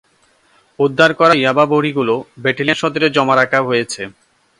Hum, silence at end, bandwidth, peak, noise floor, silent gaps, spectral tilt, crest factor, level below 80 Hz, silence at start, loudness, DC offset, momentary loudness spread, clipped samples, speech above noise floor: none; 0.5 s; 11.5 kHz; 0 dBFS; -56 dBFS; none; -5 dB/octave; 16 dB; -60 dBFS; 0.8 s; -14 LUFS; under 0.1%; 8 LU; under 0.1%; 41 dB